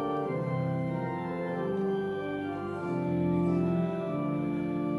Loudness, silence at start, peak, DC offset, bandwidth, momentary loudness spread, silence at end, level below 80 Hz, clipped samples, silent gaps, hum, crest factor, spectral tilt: -31 LUFS; 0 s; -16 dBFS; under 0.1%; 11.5 kHz; 6 LU; 0 s; -60 dBFS; under 0.1%; none; none; 14 dB; -9.5 dB/octave